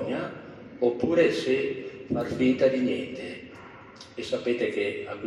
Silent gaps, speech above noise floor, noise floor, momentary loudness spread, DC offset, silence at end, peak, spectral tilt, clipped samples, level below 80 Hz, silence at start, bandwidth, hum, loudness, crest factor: none; 21 dB; -47 dBFS; 20 LU; under 0.1%; 0 s; -10 dBFS; -6 dB/octave; under 0.1%; -64 dBFS; 0 s; 11.5 kHz; none; -27 LUFS; 18 dB